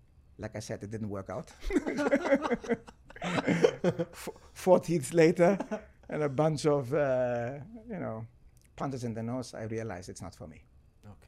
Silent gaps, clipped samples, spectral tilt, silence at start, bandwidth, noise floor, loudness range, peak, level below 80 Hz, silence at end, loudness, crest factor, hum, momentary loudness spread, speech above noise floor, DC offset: none; under 0.1%; -6.5 dB/octave; 0.4 s; 15.5 kHz; -54 dBFS; 11 LU; -8 dBFS; -54 dBFS; 0.15 s; -31 LUFS; 24 dB; none; 18 LU; 24 dB; under 0.1%